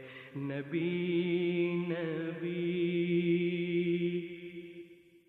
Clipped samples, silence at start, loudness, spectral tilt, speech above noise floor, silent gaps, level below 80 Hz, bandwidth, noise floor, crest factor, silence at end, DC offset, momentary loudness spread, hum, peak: under 0.1%; 0 s; -33 LUFS; -9.5 dB/octave; 21 dB; none; -76 dBFS; 4.2 kHz; -54 dBFS; 14 dB; 0.35 s; under 0.1%; 15 LU; none; -20 dBFS